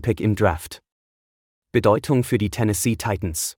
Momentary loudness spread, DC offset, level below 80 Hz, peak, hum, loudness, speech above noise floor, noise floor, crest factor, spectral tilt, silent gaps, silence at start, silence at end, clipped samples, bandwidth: 9 LU; under 0.1%; -44 dBFS; -4 dBFS; none; -21 LUFS; over 69 dB; under -90 dBFS; 18 dB; -5.5 dB/octave; 0.92-1.62 s; 0 s; 0.05 s; under 0.1%; 18 kHz